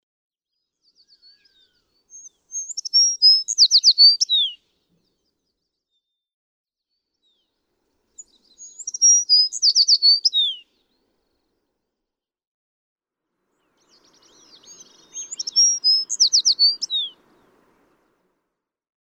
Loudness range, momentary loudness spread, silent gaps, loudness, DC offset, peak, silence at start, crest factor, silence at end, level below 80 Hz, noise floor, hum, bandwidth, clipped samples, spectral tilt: 9 LU; 19 LU; 6.34-6.64 s, 12.47-12.96 s; -14 LUFS; under 0.1%; -4 dBFS; 2.55 s; 18 dB; 2.05 s; -82 dBFS; -85 dBFS; none; 18 kHz; under 0.1%; 5.5 dB/octave